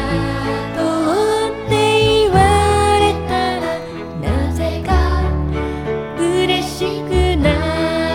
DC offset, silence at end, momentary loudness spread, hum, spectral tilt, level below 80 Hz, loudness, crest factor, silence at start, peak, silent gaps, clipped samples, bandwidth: under 0.1%; 0 s; 9 LU; none; -5.5 dB/octave; -24 dBFS; -17 LUFS; 14 dB; 0 s; -2 dBFS; none; under 0.1%; 16.5 kHz